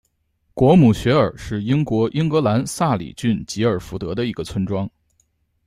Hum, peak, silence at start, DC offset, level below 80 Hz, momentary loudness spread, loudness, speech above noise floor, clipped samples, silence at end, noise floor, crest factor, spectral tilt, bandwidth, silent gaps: none; -4 dBFS; 0.55 s; under 0.1%; -44 dBFS; 12 LU; -19 LUFS; 48 dB; under 0.1%; 0.8 s; -66 dBFS; 16 dB; -7 dB/octave; 15 kHz; none